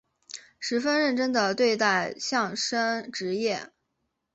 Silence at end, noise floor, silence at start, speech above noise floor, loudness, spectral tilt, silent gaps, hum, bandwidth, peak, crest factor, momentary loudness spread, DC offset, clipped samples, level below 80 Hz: 0.7 s; -79 dBFS; 0.35 s; 53 dB; -26 LUFS; -3 dB/octave; none; none; 8.2 kHz; -8 dBFS; 18 dB; 11 LU; under 0.1%; under 0.1%; -72 dBFS